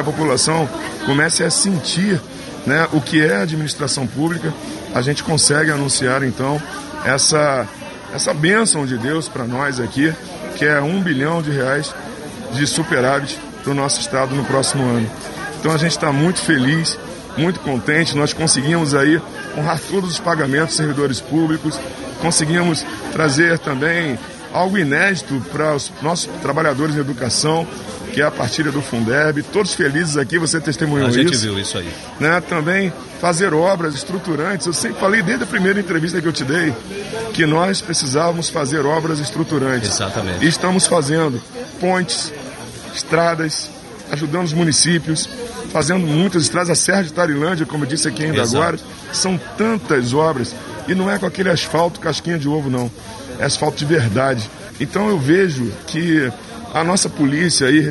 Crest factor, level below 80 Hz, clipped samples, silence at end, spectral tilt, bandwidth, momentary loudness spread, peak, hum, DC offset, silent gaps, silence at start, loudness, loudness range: 18 dB; -48 dBFS; under 0.1%; 0 s; -4 dB/octave; 12 kHz; 10 LU; 0 dBFS; none; under 0.1%; none; 0 s; -17 LUFS; 2 LU